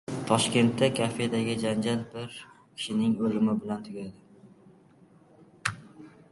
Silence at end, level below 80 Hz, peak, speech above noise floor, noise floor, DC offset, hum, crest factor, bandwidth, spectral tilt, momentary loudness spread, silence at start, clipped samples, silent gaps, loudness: 0.2 s; -64 dBFS; -8 dBFS; 30 dB; -58 dBFS; under 0.1%; none; 22 dB; 11.5 kHz; -5 dB/octave; 17 LU; 0.1 s; under 0.1%; none; -28 LUFS